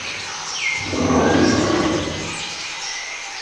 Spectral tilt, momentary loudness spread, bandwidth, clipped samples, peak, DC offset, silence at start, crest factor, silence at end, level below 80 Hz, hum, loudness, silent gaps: -4 dB/octave; 10 LU; 11 kHz; under 0.1%; -4 dBFS; under 0.1%; 0 s; 16 dB; 0 s; -44 dBFS; none; -20 LUFS; none